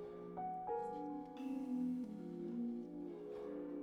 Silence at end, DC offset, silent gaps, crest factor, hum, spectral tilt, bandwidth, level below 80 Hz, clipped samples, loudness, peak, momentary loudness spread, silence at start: 0 s; under 0.1%; none; 12 dB; none; -8.5 dB/octave; 8 kHz; -76 dBFS; under 0.1%; -45 LUFS; -32 dBFS; 7 LU; 0 s